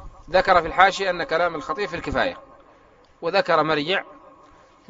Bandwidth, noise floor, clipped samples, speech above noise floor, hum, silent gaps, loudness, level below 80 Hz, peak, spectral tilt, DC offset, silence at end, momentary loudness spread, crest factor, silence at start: 8 kHz; -54 dBFS; under 0.1%; 33 dB; none; none; -21 LUFS; -46 dBFS; 0 dBFS; -1.5 dB/octave; under 0.1%; 0.75 s; 10 LU; 24 dB; 0 s